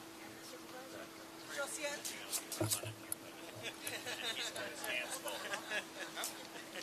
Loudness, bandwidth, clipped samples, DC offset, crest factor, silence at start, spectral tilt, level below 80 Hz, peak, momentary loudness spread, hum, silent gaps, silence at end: -42 LUFS; 14 kHz; under 0.1%; under 0.1%; 26 dB; 0 s; -2 dB/octave; -80 dBFS; -18 dBFS; 11 LU; none; none; 0 s